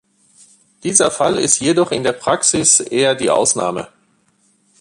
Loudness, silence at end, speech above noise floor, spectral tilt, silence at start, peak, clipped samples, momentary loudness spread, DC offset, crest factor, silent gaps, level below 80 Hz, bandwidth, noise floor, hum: -14 LUFS; 0.95 s; 43 dB; -2.5 dB/octave; 0.85 s; 0 dBFS; under 0.1%; 10 LU; under 0.1%; 18 dB; none; -54 dBFS; 11.5 kHz; -59 dBFS; none